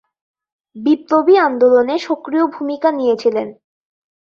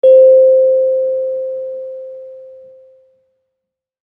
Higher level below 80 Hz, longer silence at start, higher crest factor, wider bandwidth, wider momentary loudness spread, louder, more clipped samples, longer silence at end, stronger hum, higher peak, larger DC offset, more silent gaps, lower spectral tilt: first, -64 dBFS vs -72 dBFS; first, 0.75 s vs 0.05 s; about the same, 14 dB vs 12 dB; first, 7 kHz vs 3.5 kHz; second, 9 LU vs 24 LU; second, -15 LUFS vs -11 LUFS; neither; second, 0.85 s vs 1.65 s; neither; about the same, -2 dBFS vs -2 dBFS; neither; neither; second, -5.5 dB/octave vs -7 dB/octave